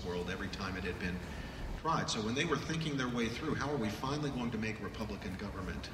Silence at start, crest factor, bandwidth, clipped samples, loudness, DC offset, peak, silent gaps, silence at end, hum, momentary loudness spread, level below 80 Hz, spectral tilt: 0 s; 18 dB; 16 kHz; under 0.1%; -37 LUFS; under 0.1%; -20 dBFS; none; 0 s; none; 8 LU; -50 dBFS; -5 dB/octave